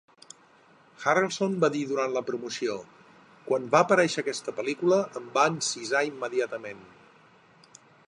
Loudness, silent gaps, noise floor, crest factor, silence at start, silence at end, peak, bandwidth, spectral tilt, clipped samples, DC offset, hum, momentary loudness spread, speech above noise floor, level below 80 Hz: -27 LUFS; none; -58 dBFS; 22 dB; 1 s; 1.25 s; -6 dBFS; 11 kHz; -4 dB/octave; under 0.1%; under 0.1%; none; 10 LU; 31 dB; -76 dBFS